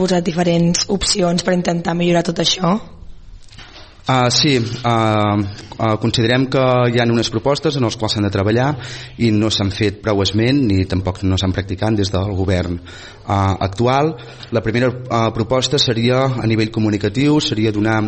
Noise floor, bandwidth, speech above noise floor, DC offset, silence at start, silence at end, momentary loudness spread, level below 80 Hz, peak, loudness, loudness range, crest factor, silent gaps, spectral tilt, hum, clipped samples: -38 dBFS; 8.8 kHz; 22 dB; under 0.1%; 0 s; 0 s; 6 LU; -40 dBFS; -2 dBFS; -17 LUFS; 3 LU; 16 dB; none; -5 dB/octave; none; under 0.1%